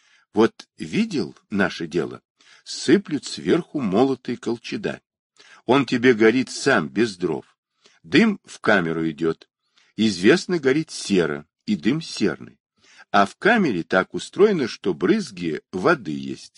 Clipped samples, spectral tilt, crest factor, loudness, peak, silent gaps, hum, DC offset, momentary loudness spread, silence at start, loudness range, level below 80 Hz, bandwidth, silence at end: under 0.1%; -5.5 dB/octave; 20 dB; -22 LUFS; -2 dBFS; 2.25-2.35 s, 5.19-5.30 s, 7.58-7.63 s, 12.60-12.65 s; none; under 0.1%; 10 LU; 0.35 s; 3 LU; -62 dBFS; 11 kHz; 0.1 s